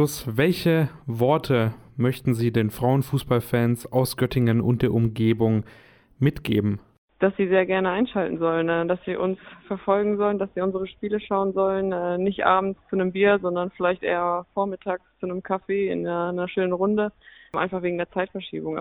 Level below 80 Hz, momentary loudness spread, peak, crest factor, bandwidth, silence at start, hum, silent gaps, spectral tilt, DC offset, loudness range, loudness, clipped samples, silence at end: -52 dBFS; 8 LU; -4 dBFS; 20 dB; 19 kHz; 0 s; none; 6.98-7.08 s; -7 dB/octave; under 0.1%; 3 LU; -24 LUFS; under 0.1%; 0 s